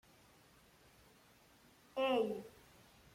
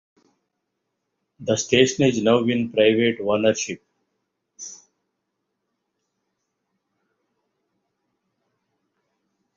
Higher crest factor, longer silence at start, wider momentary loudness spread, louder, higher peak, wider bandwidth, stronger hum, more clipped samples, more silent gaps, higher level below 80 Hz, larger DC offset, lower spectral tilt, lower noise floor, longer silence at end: about the same, 20 dB vs 22 dB; first, 1.95 s vs 1.4 s; first, 28 LU vs 20 LU; second, -39 LUFS vs -20 LUFS; second, -24 dBFS vs -2 dBFS; first, 16.5 kHz vs 7.6 kHz; neither; neither; neither; second, -76 dBFS vs -62 dBFS; neither; about the same, -5 dB/octave vs -4.5 dB/octave; second, -67 dBFS vs -78 dBFS; second, 0.65 s vs 4.8 s